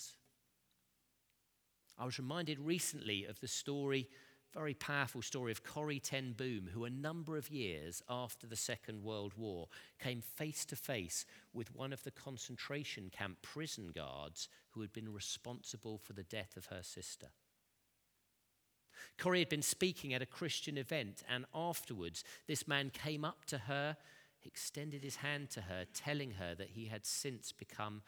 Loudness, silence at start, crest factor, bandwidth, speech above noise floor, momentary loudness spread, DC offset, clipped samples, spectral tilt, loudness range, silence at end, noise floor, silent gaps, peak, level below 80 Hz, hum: -43 LUFS; 0 s; 26 dB; over 20 kHz; 36 dB; 11 LU; under 0.1%; under 0.1%; -3.5 dB/octave; 8 LU; 0.05 s; -80 dBFS; none; -20 dBFS; -78 dBFS; none